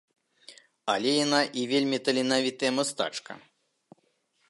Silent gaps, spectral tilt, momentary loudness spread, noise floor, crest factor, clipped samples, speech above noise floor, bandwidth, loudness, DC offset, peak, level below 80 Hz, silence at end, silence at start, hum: none; -3 dB/octave; 13 LU; -71 dBFS; 22 dB; under 0.1%; 45 dB; 11.5 kHz; -27 LUFS; under 0.1%; -8 dBFS; -78 dBFS; 1.1 s; 0.5 s; none